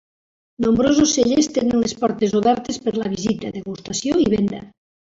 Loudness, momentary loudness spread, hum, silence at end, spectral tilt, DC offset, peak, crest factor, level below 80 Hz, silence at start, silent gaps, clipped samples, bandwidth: -19 LUFS; 10 LU; none; 0.35 s; -4.5 dB/octave; under 0.1%; -4 dBFS; 14 dB; -48 dBFS; 0.6 s; none; under 0.1%; 8 kHz